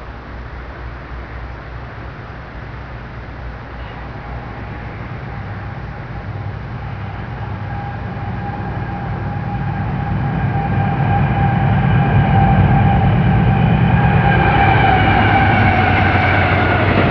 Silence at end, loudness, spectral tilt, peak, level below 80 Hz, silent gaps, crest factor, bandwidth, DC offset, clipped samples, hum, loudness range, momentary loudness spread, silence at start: 0 s; -15 LUFS; -9.5 dB/octave; -2 dBFS; -28 dBFS; none; 14 dB; 5.4 kHz; 0.3%; under 0.1%; none; 17 LU; 18 LU; 0 s